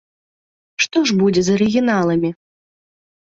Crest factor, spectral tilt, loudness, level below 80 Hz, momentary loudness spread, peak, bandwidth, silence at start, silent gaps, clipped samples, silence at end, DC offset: 16 dB; -5 dB/octave; -17 LUFS; -54 dBFS; 6 LU; -4 dBFS; 7.8 kHz; 0.8 s; none; under 0.1%; 0.9 s; under 0.1%